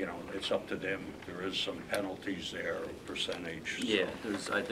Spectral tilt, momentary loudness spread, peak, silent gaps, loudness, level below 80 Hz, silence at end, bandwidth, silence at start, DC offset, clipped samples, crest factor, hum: -3.5 dB/octave; 8 LU; -14 dBFS; none; -36 LUFS; -62 dBFS; 0 s; 16 kHz; 0 s; under 0.1%; under 0.1%; 22 dB; none